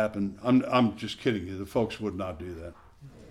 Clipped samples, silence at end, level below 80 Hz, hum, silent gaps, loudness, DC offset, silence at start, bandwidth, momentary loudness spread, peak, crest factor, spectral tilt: under 0.1%; 0 s; -54 dBFS; none; none; -28 LUFS; under 0.1%; 0 s; 13 kHz; 16 LU; -12 dBFS; 18 dB; -7 dB/octave